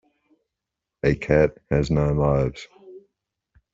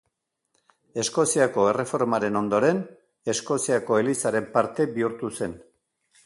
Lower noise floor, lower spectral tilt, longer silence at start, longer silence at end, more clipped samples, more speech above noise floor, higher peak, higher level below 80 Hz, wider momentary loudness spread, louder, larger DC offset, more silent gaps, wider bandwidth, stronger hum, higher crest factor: first, -85 dBFS vs -78 dBFS; first, -8 dB/octave vs -4.5 dB/octave; about the same, 1.05 s vs 0.95 s; about the same, 0.75 s vs 0.65 s; neither; first, 64 dB vs 54 dB; about the same, -4 dBFS vs -6 dBFS; first, -38 dBFS vs -64 dBFS; about the same, 10 LU vs 10 LU; about the same, -22 LUFS vs -24 LUFS; neither; neither; second, 7.6 kHz vs 12 kHz; neither; about the same, 20 dB vs 20 dB